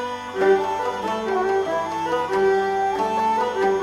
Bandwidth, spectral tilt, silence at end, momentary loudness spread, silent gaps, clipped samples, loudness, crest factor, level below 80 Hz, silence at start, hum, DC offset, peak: 13 kHz; -5 dB/octave; 0 s; 5 LU; none; under 0.1%; -22 LUFS; 14 dB; -58 dBFS; 0 s; none; under 0.1%; -8 dBFS